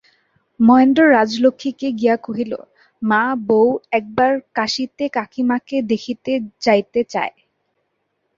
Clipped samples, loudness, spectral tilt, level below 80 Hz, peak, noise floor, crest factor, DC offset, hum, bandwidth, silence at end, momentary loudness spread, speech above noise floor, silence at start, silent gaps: under 0.1%; -17 LUFS; -5.5 dB/octave; -60 dBFS; -2 dBFS; -71 dBFS; 16 dB; under 0.1%; none; 7.6 kHz; 1.1 s; 12 LU; 54 dB; 0.6 s; none